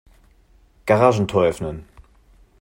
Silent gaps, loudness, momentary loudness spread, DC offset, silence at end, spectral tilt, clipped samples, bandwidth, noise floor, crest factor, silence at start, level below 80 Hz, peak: none; -19 LUFS; 16 LU; under 0.1%; 0.6 s; -6.5 dB/octave; under 0.1%; 16.5 kHz; -54 dBFS; 22 dB; 0.85 s; -48 dBFS; 0 dBFS